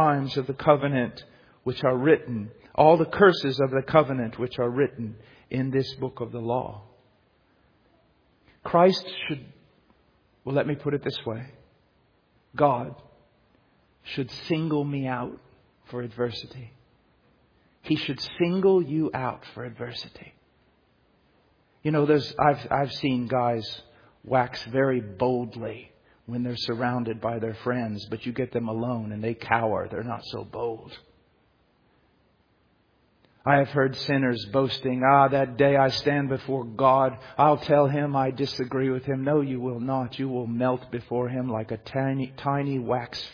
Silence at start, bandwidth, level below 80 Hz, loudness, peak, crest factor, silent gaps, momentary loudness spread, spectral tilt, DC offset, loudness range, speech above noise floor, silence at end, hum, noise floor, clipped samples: 0 s; 5.4 kHz; -60 dBFS; -25 LUFS; -4 dBFS; 22 dB; none; 15 LU; -7.5 dB/octave; under 0.1%; 10 LU; 40 dB; 0 s; none; -65 dBFS; under 0.1%